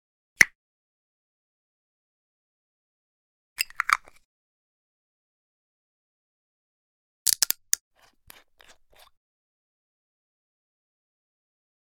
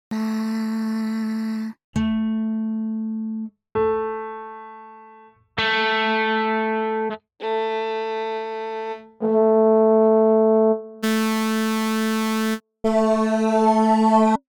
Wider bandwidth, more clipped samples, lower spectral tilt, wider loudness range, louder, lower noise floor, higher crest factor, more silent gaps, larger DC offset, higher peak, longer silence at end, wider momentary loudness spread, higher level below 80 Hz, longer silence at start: second, 18 kHz vs over 20 kHz; neither; second, 1.5 dB/octave vs -5.5 dB/octave; about the same, 5 LU vs 7 LU; second, -24 LUFS vs -21 LUFS; first, -57 dBFS vs -49 dBFS; first, 34 dB vs 14 dB; first, 0.55-3.56 s, 4.25-7.26 s vs 1.84-1.93 s; neither; first, 0 dBFS vs -6 dBFS; first, 4.4 s vs 0.15 s; about the same, 11 LU vs 13 LU; second, -66 dBFS vs -56 dBFS; first, 0.4 s vs 0.1 s